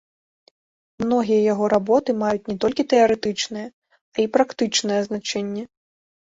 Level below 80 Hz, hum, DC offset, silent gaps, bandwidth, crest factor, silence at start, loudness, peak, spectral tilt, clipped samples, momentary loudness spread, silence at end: -60 dBFS; none; under 0.1%; 3.73-3.82 s, 4.01-4.12 s; 8 kHz; 18 dB; 1 s; -21 LUFS; -4 dBFS; -4 dB/octave; under 0.1%; 12 LU; 0.65 s